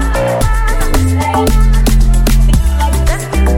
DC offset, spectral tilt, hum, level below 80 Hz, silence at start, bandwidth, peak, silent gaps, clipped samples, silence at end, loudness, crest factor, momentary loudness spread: under 0.1%; -5.5 dB/octave; none; -10 dBFS; 0 s; 17 kHz; 0 dBFS; none; under 0.1%; 0 s; -13 LUFS; 8 dB; 3 LU